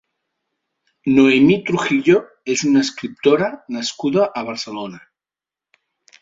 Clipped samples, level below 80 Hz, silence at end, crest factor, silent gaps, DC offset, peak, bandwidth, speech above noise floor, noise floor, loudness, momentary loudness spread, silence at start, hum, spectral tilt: under 0.1%; -58 dBFS; 1.25 s; 16 dB; none; under 0.1%; -2 dBFS; 7.8 kHz; 73 dB; -90 dBFS; -17 LUFS; 13 LU; 1.05 s; none; -5 dB/octave